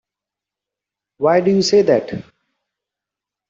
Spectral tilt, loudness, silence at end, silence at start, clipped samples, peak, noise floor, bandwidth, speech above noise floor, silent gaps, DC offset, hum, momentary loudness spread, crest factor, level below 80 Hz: -5 dB/octave; -15 LUFS; 1.3 s; 1.2 s; under 0.1%; -2 dBFS; -86 dBFS; 7.8 kHz; 72 dB; none; under 0.1%; none; 15 LU; 18 dB; -60 dBFS